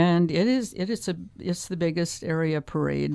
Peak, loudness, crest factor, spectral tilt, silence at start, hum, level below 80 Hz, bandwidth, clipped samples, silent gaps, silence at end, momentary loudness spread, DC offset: -6 dBFS; -26 LUFS; 18 dB; -6 dB/octave; 0 s; none; -54 dBFS; 11 kHz; under 0.1%; none; 0 s; 9 LU; under 0.1%